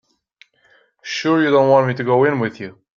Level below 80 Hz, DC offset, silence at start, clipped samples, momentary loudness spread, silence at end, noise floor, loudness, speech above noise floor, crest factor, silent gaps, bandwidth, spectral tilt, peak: -64 dBFS; under 0.1%; 1.05 s; under 0.1%; 15 LU; 0.25 s; -57 dBFS; -16 LUFS; 41 dB; 16 dB; none; 7.4 kHz; -6.5 dB/octave; -2 dBFS